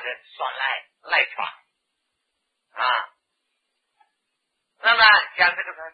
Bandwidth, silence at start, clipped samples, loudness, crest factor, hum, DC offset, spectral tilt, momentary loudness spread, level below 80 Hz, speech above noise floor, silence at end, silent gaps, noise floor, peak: 5 kHz; 0 s; under 0.1%; -20 LUFS; 22 dB; none; under 0.1%; -3 dB/octave; 17 LU; -64 dBFS; 51 dB; 0.05 s; none; -77 dBFS; -2 dBFS